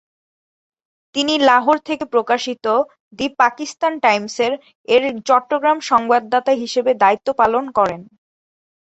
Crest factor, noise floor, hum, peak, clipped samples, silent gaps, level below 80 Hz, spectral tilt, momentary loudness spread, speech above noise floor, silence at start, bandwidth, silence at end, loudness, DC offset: 16 dB; under -90 dBFS; none; -2 dBFS; under 0.1%; 3.00-3.11 s, 4.75-4.84 s; -60 dBFS; -3 dB/octave; 6 LU; over 73 dB; 1.15 s; 8.2 kHz; 0.8 s; -17 LUFS; under 0.1%